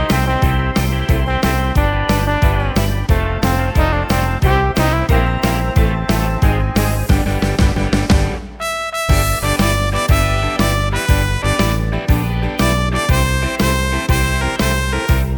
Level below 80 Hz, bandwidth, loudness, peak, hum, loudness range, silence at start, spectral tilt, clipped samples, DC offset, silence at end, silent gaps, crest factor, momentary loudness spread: -20 dBFS; 19.5 kHz; -16 LUFS; 0 dBFS; none; 1 LU; 0 s; -5.5 dB/octave; under 0.1%; under 0.1%; 0 s; none; 14 dB; 2 LU